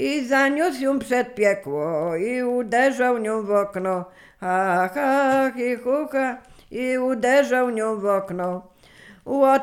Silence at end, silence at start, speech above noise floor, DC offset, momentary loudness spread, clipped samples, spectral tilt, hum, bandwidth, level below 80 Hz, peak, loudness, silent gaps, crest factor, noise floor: 0 s; 0 s; 27 dB; under 0.1%; 9 LU; under 0.1%; -5 dB/octave; none; 16 kHz; -60 dBFS; -6 dBFS; -22 LUFS; none; 16 dB; -49 dBFS